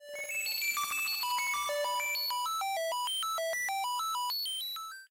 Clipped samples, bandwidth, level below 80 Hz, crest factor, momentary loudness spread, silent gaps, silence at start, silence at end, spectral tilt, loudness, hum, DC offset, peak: under 0.1%; 16 kHz; -78 dBFS; 10 dB; 3 LU; none; 0 s; 0.05 s; 3 dB/octave; -32 LUFS; none; under 0.1%; -24 dBFS